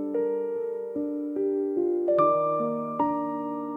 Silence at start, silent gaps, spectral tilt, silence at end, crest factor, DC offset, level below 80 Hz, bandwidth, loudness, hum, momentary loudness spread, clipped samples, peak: 0 s; none; -10 dB/octave; 0 s; 16 dB; under 0.1%; -70 dBFS; 3.8 kHz; -27 LUFS; none; 9 LU; under 0.1%; -12 dBFS